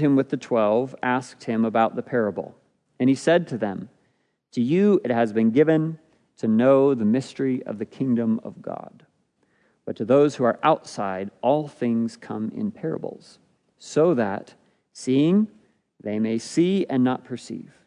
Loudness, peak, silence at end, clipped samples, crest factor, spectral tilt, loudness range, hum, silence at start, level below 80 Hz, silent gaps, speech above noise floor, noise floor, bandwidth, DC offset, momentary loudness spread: -23 LUFS; -4 dBFS; 0.25 s; under 0.1%; 18 dB; -7 dB/octave; 5 LU; none; 0 s; -74 dBFS; none; 47 dB; -69 dBFS; 10.5 kHz; under 0.1%; 15 LU